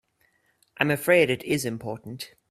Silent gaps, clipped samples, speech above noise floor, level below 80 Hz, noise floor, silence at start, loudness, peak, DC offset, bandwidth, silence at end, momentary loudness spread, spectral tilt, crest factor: none; under 0.1%; 43 dB; -64 dBFS; -68 dBFS; 0.8 s; -24 LUFS; -4 dBFS; under 0.1%; 15.5 kHz; 0.25 s; 17 LU; -5 dB/octave; 24 dB